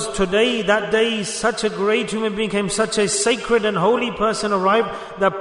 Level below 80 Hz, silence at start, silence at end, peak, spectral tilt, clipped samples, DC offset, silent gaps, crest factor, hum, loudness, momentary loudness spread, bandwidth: -46 dBFS; 0 s; 0 s; -4 dBFS; -3.5 dB/octave; under 0.1%; under 0.1%; none; 16 dB; none; -19 LUFS; 4 LU; 11 kHz